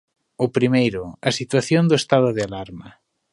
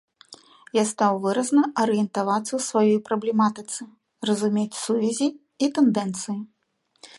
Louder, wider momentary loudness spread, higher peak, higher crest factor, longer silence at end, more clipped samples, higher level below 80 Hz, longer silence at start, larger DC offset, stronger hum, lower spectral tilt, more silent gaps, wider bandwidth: first, -20 LUFS vs -23 LUFS; about the same, 13 LU vs 11 LU; first, -2 dBFS vs -8 dBFS; about the same, 20 dB vs 16 dB; first, 0.4 s vs 0.1 s; neither; first, -54 dBFS vs -74 dBFS; about the same, 0.4 s vs 0.3 s; neither; neither; about the same, -5.5 dB/octave vs -5 dB/octave; neither; about the same, 11.5 kHz vs 11.5 kHz